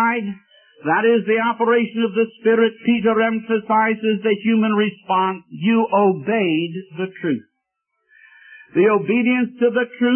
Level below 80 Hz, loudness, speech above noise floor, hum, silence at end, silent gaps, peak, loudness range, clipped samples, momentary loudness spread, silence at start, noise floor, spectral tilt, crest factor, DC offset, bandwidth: -66 dBFS; -19 LUFS; 57 dB; none; 0 s; none; -4 dBFS; 4 LU; under 0.1%; 8 LU; 0 s; -75 dBFS; -11 dB/octave; 14 dB; under 0.1%; 3.4 kHz